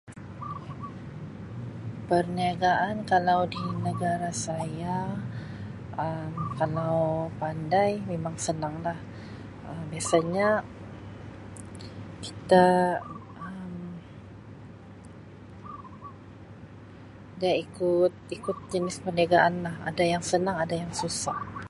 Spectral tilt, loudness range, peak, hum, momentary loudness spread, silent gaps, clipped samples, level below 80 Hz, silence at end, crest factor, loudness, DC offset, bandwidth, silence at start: -5.5 dB/octave; 9 LU; -6 dBFS; none; 22 LU; none; under 0.1%; -56 dBFS; 0 s; 22 dB; -28 LUFS; under 0.1%; 11.5 kHz; 0.05 s